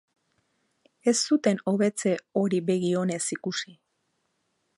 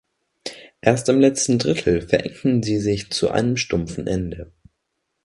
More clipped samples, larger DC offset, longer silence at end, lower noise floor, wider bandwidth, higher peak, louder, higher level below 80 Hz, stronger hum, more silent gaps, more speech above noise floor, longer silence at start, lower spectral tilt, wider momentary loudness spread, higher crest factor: neither; neither; first, 1.05 s vs 0.8 s; about the same, -75 dBFS vs -76 dBFS; about the same, 11.5 kHz vs 11.5 kHz; second, -10 dBFS vs 0 dBFS; second, -26 LUFS vs -20 LUFS; second, -76 dBFS vs -44 dBFS; neither; neither; second, 50 dB vs 56 dB; first, 1.05 s vs 0.45 s; about the same, -4.5 dB/octave vs -5 dB/octave; second, 8 LU vs 17 LU; about the same, 18 dB vs 20 dB